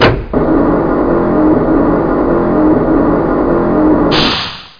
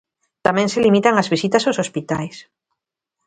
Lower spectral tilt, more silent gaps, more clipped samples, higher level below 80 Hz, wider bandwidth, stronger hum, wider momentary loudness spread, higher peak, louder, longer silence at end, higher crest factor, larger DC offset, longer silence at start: first, -7.5 dB/octave vs -5 dB/octave; neither; neither; first, -26 dBFS vs -56 dBFS; second, 5.2 kHz vs 9.4 kHz; neither; second, 2 LU vs 10 LU; about the same, 0 dBFS vs 0 dBFS; first, -11 LUFS vs -18 LUFS; second, 0.1 s vs 0.85 s; second, 10 dB vs 20 dB; neither; second, 0 s vs 0.45 s